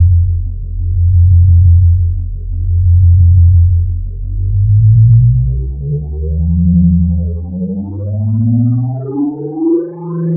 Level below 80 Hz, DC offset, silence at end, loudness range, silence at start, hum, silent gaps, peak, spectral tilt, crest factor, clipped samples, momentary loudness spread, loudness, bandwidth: -20 dBFS; under 0.1%; 0 s; 5 LU; 0 s; none; none; 0 dBFS; -17.5 dB/octave; 10 dB; under 0.1%; 12 LU; -12 LUFS; 1.3 kHz